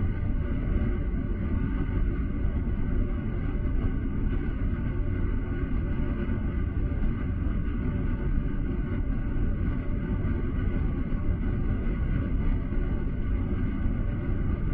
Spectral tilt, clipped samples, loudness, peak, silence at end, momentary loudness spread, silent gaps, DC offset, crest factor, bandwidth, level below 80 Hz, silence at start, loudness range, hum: -12 dB/octave; under 0.1%; -30 LUFS; -12 dBFS; 0 s; 2 LU; none; under 0.1%; 14 dB; 3.5 kHz; -28 dBFS; 0 s; 1 LU; none